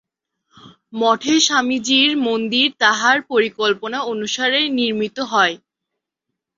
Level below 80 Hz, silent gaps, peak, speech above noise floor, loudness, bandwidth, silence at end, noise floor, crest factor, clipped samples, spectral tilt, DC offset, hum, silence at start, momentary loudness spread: -66 dBFS; none; -2 dBFS; 63 dB; -17 LUFS; 7.8 kHz; 1 s; -81 dBFS; 18 dB; under 0.1%; -2 dB/octave; under 0.1%; none; 0.65 s; 8 LU